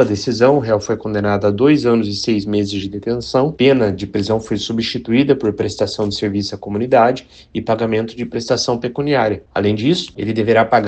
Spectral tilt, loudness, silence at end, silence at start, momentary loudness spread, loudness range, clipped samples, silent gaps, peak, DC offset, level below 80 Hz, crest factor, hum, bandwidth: -6 dB/octave; -17 LUFS; 0 s; 0 s; 9 LU; 2 LU; under 0.1%; none; 0 dBFS; under 0.1%; -46 dBFS; 16 dB; none; 8.8 kHz